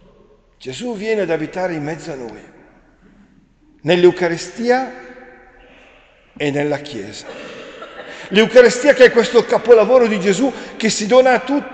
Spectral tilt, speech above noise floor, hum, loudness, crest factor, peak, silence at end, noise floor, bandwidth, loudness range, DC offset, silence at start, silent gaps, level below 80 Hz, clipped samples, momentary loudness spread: -4.5 dB/octave; 37 dB; none; -14 LUFS; 16 dB; 0 dBFS; 0 s; -52 dBFS; 9 kHz; 12 LU; under 0.1%; 0.6 s; none; -52 dBFS; under 0.1%; 23 LU